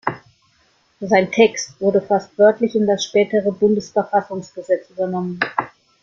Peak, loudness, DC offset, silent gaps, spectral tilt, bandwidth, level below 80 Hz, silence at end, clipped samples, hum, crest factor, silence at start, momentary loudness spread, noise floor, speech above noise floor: -2 dBFS; -18 LUFS; under 0.1%; none; -5 dB/octave; 7.6 kHz; -62 dBFS; 0.35 s; under 0.1%; none; 18 dB; 0.05 s; 12 LU; -59 dBFS; 42 dB